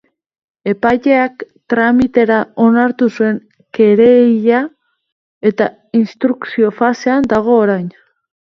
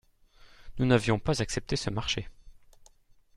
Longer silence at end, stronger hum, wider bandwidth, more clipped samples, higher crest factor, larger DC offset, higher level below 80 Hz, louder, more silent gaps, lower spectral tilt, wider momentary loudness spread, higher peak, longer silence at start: second, 0.6 s vs 0.85 s; neither; second, 6.4 kHz vs 12.5 kHz; neither; second, 14 dB vs 24 dB; neither; about the same, -50 dBFS vs -46 dBFS; first, -13 LUFS vs -29 LUFS; first, 5.12-5.41 s vs none; first, -7.5 dB/octave vs -5 dB/octave; about the same, 11 LU vs 12 LU; first, 0 dBFS vs -8 dBFS; first, 0.65 s vs 0.45 s